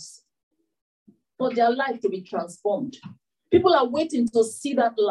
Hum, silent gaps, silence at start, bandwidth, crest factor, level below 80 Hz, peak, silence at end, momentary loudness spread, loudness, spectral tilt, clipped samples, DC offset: none; 0.43-0.51 s, 0.81-1.06 s; 0 s; 12 kHz; 18 dB; -66 dBFS; -6 dBFS; 0 s; 11 LU; -23 LUFS; -4.5 dB/octave; under 0.1%; under 0.1%